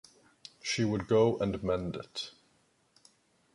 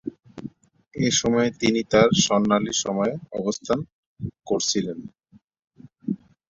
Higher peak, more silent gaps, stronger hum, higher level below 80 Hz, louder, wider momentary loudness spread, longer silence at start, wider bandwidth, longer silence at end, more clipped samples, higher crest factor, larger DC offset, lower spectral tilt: second, -14 dBFS vs -4 dBFS; second, none vs 3.92-4.16 s, 5.44-5.48 s; neither; about the same, -58 dBFS vs -54 dBFS; second, -31 LUFS vs -22 LUFS; second, 17 LU vs 21 LU; first, 0.65 s vs 0.05 s; first, 11.5 kHz vs 7.8 kHz; first, 1.25 s vs 0.35 s; neither; about the same, 18 dB vs 20 dB; neither; first, -5.5 dB/octave vs -4 dB/octave